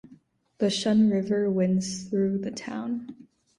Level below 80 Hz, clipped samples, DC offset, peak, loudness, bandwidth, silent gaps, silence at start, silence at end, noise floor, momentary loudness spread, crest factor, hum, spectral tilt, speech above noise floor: -66 dBFS; under 0.1%; under 0.1%; -12 dBFS; -26 LUFS; 11.5 kHz; none; 0.1 s; 0.35 s; -57 dBFS; 11 LU; 14 dB; none; -6 dB/octave; 32 dB